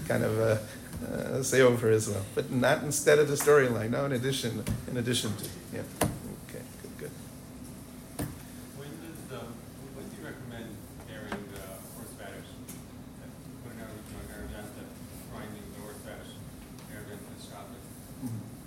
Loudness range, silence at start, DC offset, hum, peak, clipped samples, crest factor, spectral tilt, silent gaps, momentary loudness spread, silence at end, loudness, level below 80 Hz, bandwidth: 18 LU; 0 s; under 0.1%; none; -10 dBFS; under 0.1%; 22 dB; -4.5 dB/octave; none; 22 LU; 0 s; -29 LUFS; -54 dBFS; 16 kHz